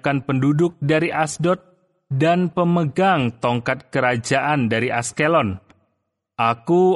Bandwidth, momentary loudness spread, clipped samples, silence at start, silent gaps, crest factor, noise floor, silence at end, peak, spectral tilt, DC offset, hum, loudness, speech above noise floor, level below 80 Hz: 11.5 kHz; 5 LU; under 0.1%; 0.05 s; none; 16 dB; -74 dBFS; 0 s; -4 dBFS; -6 dB/octave; under 0.1%; none; -20 LUFS; 55 dB; -56 dBFS